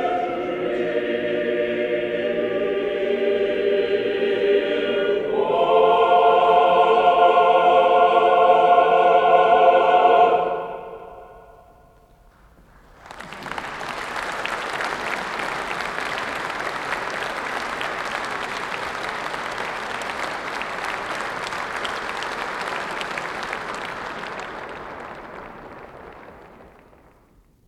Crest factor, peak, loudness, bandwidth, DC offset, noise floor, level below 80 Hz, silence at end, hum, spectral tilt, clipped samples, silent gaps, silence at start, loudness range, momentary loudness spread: 18 dB; -2 dBFS; -20 LUFS; 13 kHz; under 0.1%; -56 dBFS; -56 dBFS; 1 s; none; -4 dB/octave; under 0.1%; none; 0 s; 17 LU; 17 LU